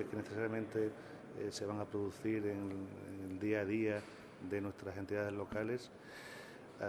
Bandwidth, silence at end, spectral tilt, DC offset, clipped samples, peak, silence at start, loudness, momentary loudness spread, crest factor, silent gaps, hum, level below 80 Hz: 19 kHz; 0 s; -6.5 dB/octave; under 0.1%; under 0.1%; -24 dBFS; 0 s; -41 LUFS; 14 LU; 18 dB; none; none; -72 dBFS